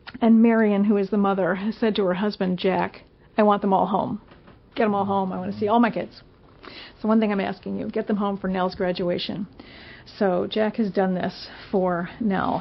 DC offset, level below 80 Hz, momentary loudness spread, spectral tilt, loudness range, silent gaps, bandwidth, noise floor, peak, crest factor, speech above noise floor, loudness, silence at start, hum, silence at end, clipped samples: under 0.1%; -56 dBFS; 15 LU; -5.5 dB/octave; 4 LU; none; 5.8 kHz; -45 dBFS; -6 dBFS; 18 dB; 23 dB; -23 LUFS; 0.05 s; none; 0 s; under 0.1%